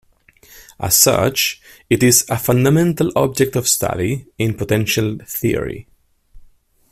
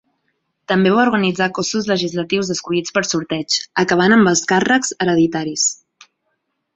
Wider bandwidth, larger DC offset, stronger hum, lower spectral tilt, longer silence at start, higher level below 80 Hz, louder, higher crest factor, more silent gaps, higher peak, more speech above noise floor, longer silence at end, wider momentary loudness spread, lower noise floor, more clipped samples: first, 16 kHz vs 8.4 kHz; neither; neither; about the same, -4 dB/octave vs -3.5 dB/octave; about the same, 0.6 s vs 0.7 s; first, -44 dBFS vs -56 dBFS; about the same, -16 LUFS vs -16 LUFS; about the same, 18 dB vs 16 dB; neither; about the same, 0 dBFS vs -2 dBFS; second, 33 dB vs 55 dB; second, 0.5 s vs 1 s; first, 10 LU vs 7 LU; second, -50 dBFS vs -71 dBFS; neither